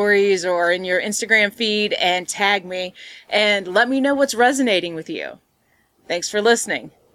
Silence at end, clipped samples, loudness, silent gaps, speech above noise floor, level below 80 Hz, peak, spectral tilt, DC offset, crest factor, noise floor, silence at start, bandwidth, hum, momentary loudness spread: 0.25 s; under 0.1%; -18 LUFS; none; 43 dB; -64 dBFS; -2 dBFS; -2.5 dB/octave; under 0.1%; 16 dB; -63 dBFS; 0 s; 15.5 kHz; none; 12 LU